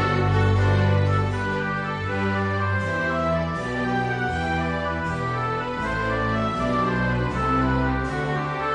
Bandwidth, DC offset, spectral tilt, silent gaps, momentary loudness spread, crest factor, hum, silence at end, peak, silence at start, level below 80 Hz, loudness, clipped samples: 9.6 kHz; under 0.1%; -7 dB/octave; none; 6 LU; 14 dB; none; 0 s; -10 dBFS; 0 s; -38 dBFS; -23 LUFS; under 0.1%